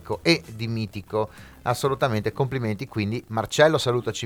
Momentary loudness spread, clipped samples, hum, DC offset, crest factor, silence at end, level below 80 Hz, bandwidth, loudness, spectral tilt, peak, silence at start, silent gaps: 10 LU; under 0.1%; none; under 0.1%; 20 dB; 0 s; -54 dBFS; 19 kHz; -24 LUFS; -5 dB/octave; -4 dBFS; 0 s; none